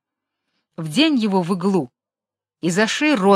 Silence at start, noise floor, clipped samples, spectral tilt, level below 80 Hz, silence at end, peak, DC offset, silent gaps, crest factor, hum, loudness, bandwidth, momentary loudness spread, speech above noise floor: 0.8 s; -89 dBFS; under 0.1%; -5 dB/octave; -70 dBFS; 0 s; -2 dBFS; under 0.1%; none; 18 dB; none; -19 LUFS; 13.5 kHz; 10 LU; 72 dB